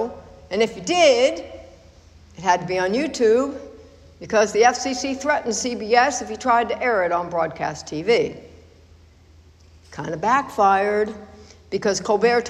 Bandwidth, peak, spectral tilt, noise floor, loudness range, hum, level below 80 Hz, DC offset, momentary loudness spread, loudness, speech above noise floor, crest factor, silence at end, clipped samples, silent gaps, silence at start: 12 kHz; -4 dBFS; -3.5 dB/octave; -50 dBFS; 4 LU; none; -52 dBFS; under 0.1%; 13 LU; -20 LUFS; 30 dB; 18 dB; 0 s; under 0.1%; none; 0 s